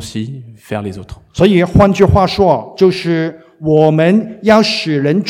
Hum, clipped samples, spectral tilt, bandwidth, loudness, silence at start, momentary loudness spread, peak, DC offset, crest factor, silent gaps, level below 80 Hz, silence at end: none; 0.3%; -6.5 dB/octave; 14.5 kHz; -12 LUFS; 0 s; 15 LU; 0 dBFS; under 0.1%; 12 dB; none; -32 dBFS; 0 s